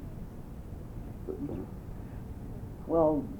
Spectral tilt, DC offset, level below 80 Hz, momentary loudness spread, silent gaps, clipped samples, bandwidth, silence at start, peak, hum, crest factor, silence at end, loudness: -9.5 dB/octave; under 0.1%; -46 dBFS; 18 LU; none; under 0.1%; over 20 kHz; 0 s; -14 dBFS; none; 20 dB; 0 s; -36 LUFS